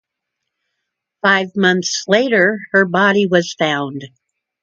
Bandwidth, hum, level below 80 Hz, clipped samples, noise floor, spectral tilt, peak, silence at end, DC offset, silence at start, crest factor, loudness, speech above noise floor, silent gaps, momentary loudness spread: 7.8 kHz; none; -66 dBFS; under 0.1%; -78 dBFS; -4 dB/octave; 0 dBFS; 0.55 s; under 0.1%; 1.25 s; 16 dB; -15 LUFS; 63 dB; none; 6 LU